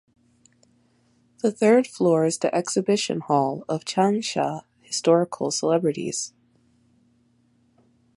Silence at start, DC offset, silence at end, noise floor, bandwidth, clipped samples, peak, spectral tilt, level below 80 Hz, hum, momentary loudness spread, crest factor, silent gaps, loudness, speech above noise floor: 1.45 s; under 0.1%; 1.9 s; -63 dBFS; 11.5 kHz; under 0.1%; -6 dBFS; -4.5 dB/octave; -72 dBFS; none; 10 LU; 20 dB; none; -23 LUFS; 41 dB